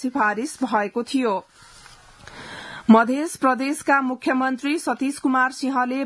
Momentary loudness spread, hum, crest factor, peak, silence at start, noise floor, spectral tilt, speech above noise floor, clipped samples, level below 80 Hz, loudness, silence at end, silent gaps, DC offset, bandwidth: 12 LU; none; 20 dB; -2 dBFS; 0 s; -47 dBFS; -4.5 dB/octave; 26 dB; under 0.1%; -62 dBFS; -21 LUFS; 0 s; none; under 0.1%; 12 kHz